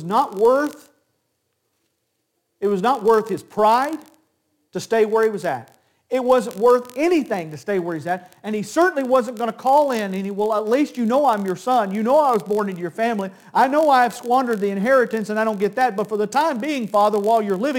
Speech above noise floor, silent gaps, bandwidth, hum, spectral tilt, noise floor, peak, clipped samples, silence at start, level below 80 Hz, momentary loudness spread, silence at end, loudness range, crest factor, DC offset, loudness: 53 dB; none; 17 kHz; none; -5.5 dB/octave; -73 dBFS; -4 dBFS; under 0.1%; 0 s; -68 dBFS; 9 LU; 0 s; 3 LU; 16 dB; under 0.1%; -20 LUFS